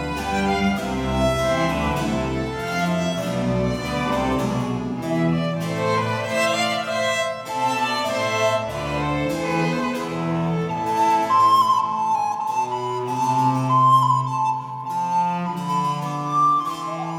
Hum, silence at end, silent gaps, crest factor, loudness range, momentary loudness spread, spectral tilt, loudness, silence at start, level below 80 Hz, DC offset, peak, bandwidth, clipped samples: none; 0 s; none; 16 dB; 3 LU; 8 LU; -5.5 dB/octave; -21 LUFS; 0 s; -42 dBFS; under 0.1%; -6 dBFS; 17.5 kHz; under 0.1%